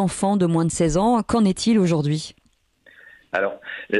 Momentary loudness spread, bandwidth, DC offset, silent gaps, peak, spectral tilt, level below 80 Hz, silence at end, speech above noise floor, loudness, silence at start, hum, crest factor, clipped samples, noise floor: 9 LU; 12 kHz; under 0.1%; none; -6 dBFS; -5.5 dB/octave; -44 dBFS; 0 s; 40 dB; -20 LUFS; 0 s; none; 14 dB; under 0.1%; -60 dBFS